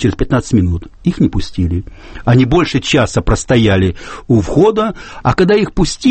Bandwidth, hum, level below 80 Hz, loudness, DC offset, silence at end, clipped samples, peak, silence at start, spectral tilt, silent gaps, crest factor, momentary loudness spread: 8.8 kHz; none; -26 dBFS; -14 LUFS; under 0.1%; 0 s; under 0.1%; 0 dBFS; 0 s; -6 dB/octave; none; 12 dB; 8 LU